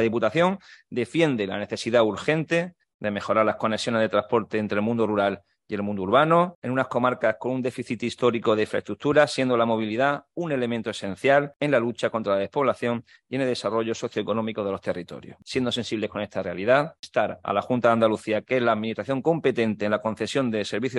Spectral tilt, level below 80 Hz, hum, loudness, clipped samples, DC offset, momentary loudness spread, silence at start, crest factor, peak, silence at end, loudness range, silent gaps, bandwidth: -6 dB/octave; -66 dBFS; none; -24 LUFS; under 0.1%; under 0.1%; 9 LU; 0 s; 20 dB; -4 dBFS; 0 s; 3 LU; 2.94-2.99 s, 6.55-6.62 s, 11.56-11.60 s, 16.99-17.03 s; 11.5 kHz